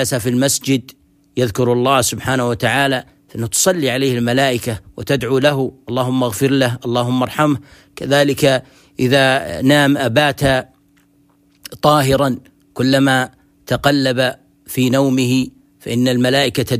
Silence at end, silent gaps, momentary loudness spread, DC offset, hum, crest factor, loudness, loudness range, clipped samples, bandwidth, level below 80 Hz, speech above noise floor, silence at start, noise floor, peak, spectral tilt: 0 s; none; 10 LU; under 0.1%; none; 16 dB; -16 LUFS; 2 LU; under 0.1%; 15.5 kHz; -46 dBFS; 39 dB; 0 s; -55 dBFS; 0 dBFS; -4.5 dB/octave